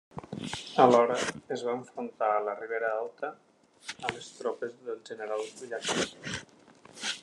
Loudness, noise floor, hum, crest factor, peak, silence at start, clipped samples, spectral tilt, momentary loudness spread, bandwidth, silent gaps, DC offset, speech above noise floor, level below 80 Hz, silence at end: -31 LUFS; -54 dBFS; none; 26 dB; -6 dBFS; 0.15 s; under 0.1%; -3.5 dB/octave; 16 LU; 12 kHz; none; under 0.1%; 24 dB; -70 dBFS; 0 s